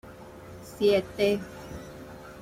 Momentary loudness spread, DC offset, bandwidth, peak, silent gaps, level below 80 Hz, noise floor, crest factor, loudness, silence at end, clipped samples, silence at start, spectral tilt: 21 LU; under 0.1%; 16 kHz; -12 dBFS; none; -54 dBFS; -45 dBFS; 18 dB; -26 LUFS; 0 s; under 0.1%; 0.05 s; -5.5 dB/octave